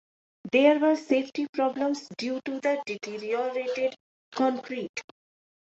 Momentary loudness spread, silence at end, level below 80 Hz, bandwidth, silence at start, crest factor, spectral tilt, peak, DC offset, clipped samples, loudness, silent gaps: 13 LU; 0.6 s; -76 dBFS; 8 kHz; 0.45 s; 18 dB; -4.5 dB/octave; -8 dBFS; under 0.1%; under 0.1%; -27 LUFS; 1.49-1.53 s, 4.00-4.32 s, 4.89-4.94 s